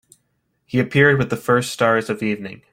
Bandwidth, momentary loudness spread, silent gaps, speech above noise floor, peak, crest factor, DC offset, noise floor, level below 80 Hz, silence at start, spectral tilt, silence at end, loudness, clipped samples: 16 kHz; 9 LU; none; 51 dB; -2 dBFS; 18 dB; under 0.1%; -69 dBFS; -54 dBFS; 0.75 s; -6 dB/octave; 0.15 s; -18 LUFS; under 0.1%